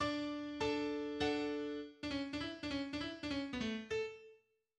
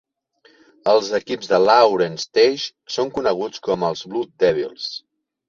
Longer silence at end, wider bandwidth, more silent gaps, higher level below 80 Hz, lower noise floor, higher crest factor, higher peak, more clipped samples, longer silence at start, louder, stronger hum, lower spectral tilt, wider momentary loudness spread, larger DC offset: about the same, 0.45 s vs 0.5 s; first, 10 kHz vs 7.4 kHz; neither; about the same, -64 dBFS vs -60 dBFS; first, -68 dBFS vs -57 dBFS; about the same, 16 dB vs 18 dB; second, -26 dBFS vs -2 dBFS; neither; second, 0 s vs 0.85 s; second, -41 LUFS vs -19 LUFS; neither; about the same, -5 dB/octave vs -4 dB/octave; second, 5 LU vs 13 LU; neither